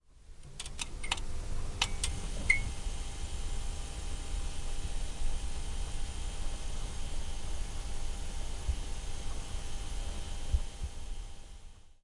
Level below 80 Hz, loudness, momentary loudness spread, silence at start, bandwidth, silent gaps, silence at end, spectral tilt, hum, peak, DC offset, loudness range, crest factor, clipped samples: -36 dBFS; -39 LUFS; 10 LU; 0.15 s; 11.5 kHz; none; 0.15 s; -3 dB/octave; none; -12 dBFS; under 0.1%; 6 LU; 22 dB; under 0.1%